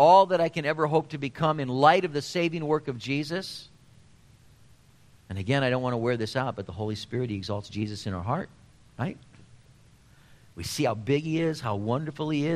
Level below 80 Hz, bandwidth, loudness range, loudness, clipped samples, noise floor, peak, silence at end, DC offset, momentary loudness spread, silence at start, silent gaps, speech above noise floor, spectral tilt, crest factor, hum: -60 dBFS; 14 kHz; 8 LU; -27 LUFS; under 0.1%; -57 dBFS; -6 dBFS; 0 s; under 0.1%; 13 LU; 0 s; none; 30 dB; -6 dB/octave; 22 dB; none